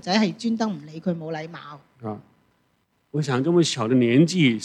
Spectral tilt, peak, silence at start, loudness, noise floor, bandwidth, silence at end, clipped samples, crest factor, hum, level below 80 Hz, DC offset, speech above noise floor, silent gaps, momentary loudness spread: -5.5 dB/octave; -6 dBFS; 0.05 s; -22 LUFS; -68 dBFS; 10.5 kHz; 0 s; under 0.1%; 18 dB; none; -72 dBFS; under 0.1%; 46 dB; none; 19 LU